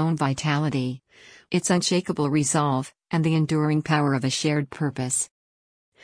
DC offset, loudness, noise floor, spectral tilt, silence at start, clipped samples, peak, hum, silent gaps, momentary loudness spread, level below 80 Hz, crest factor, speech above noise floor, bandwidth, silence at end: under 0.1%; -24 LUFS; under -90 dBFS; -5 dB/octave; 0 s; under 0.1%; -8 dBFS; none; none; 7 LU; -62 dBFS; 16 dB; over 66 dB; 10.5 kHz; 0.8 s